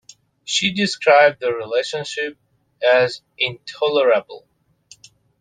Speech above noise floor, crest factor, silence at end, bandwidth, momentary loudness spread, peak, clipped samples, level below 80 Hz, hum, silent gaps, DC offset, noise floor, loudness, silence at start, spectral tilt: 33 dB; 20 dB; 1 s; 9.6 kHz; 12 LU; 0 dBFS; under 0.1%; -66 dBFS; none; none; under 0.1%; -51 dBFS; -18 LUFS; 0.45 s; -3 dB/octave